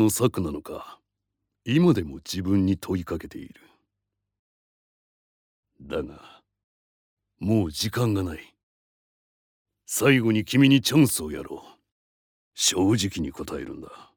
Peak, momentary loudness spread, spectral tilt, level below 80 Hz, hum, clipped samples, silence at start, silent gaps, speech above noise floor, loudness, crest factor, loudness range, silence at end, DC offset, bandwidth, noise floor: -6 dBFS; 20 LU; -5 dB/octave; -54 dBFS; none; under 0.1%; 0 s; 4.39-5.63 s, 6.64-7.17 s, 8.63-9.65 s, 11.92-12.51 s; 59 dB; -24 LUFS; 20 dB; 18 LU; 0.15 s; under 0.1%; over 20 kHz; -83 dBFS